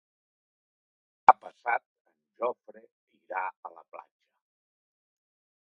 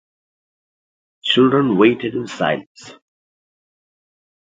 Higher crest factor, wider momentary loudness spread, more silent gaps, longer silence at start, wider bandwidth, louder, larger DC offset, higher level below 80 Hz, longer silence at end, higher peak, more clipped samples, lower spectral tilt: first, 32 dB vs 20 dB; first, 24 LU vs 12 LU; first, 1.86-2.05 s, 2.92-3.07 s, 3.57-3.63 s vs 2.67-2.75 s; about the same, 1.3 s vs 1.25 s; second, 7 kHz vs 7.8 kHz; second, -28 LUFS vs -17 LUFS; neither; second, -88 dBFS vs -64 dBFS; about the same, 1.65 s vs 1.65 s; about the same, 0 dBFS vs 0 dBFS; neither; about the same, -5 dB/octave vs -6 dB/octave